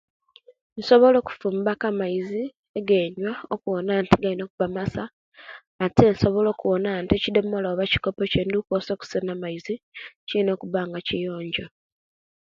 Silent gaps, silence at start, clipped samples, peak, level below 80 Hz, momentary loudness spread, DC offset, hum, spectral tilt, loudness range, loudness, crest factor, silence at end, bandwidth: 2.59-2.63 s, 2.69-2.74 s, 4.50-4.58 s, 5.13-5.32 s, 5.67-5.79 s, 9.83-9.92 s, 10.16-10.27 s; 0.75 s; under 0.1%; 0 dBFS; -48 dBFS; 15 LU; under 0.1%; none; -7 dB/octave; 5 LU; -24 LUFS; 24 dB; 0.75 s; 7.6 kHz